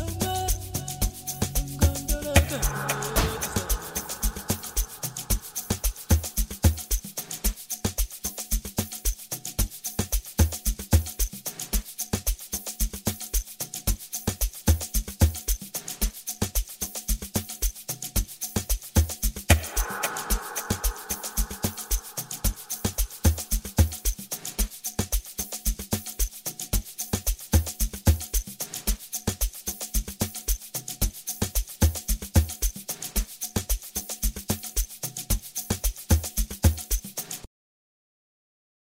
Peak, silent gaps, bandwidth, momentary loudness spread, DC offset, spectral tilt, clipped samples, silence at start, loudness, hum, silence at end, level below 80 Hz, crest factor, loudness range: -2 dBFS; none; 16.5 kHz; 6 LU; under 0.1%; -3.5 dB/octave; under 0.1%; 0 s; -28 LUFS; none; 1.45 s; -30 dBFS; 26 dB; 3 LU